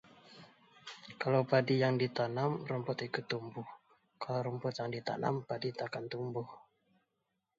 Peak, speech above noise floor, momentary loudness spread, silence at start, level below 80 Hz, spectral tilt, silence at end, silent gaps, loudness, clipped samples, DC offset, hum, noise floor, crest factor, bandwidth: -14 dBFS; 49 dB; 20 LU; 0.25 s; -78 dBFS; -5 dB/octave; 1 s; none; -36 LUFS; under 0.1%; under 0.1%; none; -84 dBFS; 22 dB; 7.6 kHz